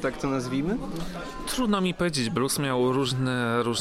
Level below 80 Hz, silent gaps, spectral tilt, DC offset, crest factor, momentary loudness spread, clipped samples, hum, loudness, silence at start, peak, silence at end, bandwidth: -46 dBFS; none; -5 dB/octave; under 0.1%; 16 dB; 9 LU; under 0.1%; none; -27 LUFS; 0 s; -10 dBFS; 0 s; 16.5 kHz